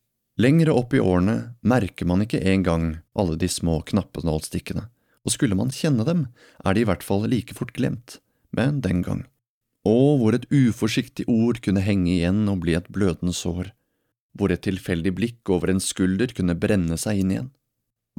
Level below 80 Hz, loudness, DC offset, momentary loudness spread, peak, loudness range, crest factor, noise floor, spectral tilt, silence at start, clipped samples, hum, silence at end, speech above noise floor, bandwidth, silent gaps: -44 dBFS; -23 LUFS; under 0.1%; 10 LU; -6 dBFS; 4 LU; 16 dB; -79 dBFS; -6 dB/octave; 0.4 s; under 0.1%; none; 0.7 s; 57 dB; 16.5 kHz; 9.49-9.61 s, 14.21-14.29 s